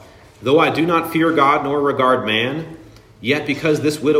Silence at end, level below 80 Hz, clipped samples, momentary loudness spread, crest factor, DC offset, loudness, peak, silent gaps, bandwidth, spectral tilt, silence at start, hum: 0 s; -54 dBFS; under 0.1%; 10 LU; 16 dB; under 0.1%; -17 LUFS; -2 dBFS; none; 16 kHz; -5.5 dB/octave; 0.4 s; none